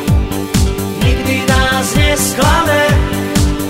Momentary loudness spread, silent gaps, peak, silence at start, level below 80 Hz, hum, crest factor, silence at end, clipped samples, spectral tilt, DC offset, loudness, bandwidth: 4 LU; none; 0 dBFS; 0 s; -18 dBFS; none; 12 dB; 0 s; under 0.1%; -4.5 dB/octave; under 0.1%; -13 LUFS; 16.5 kHz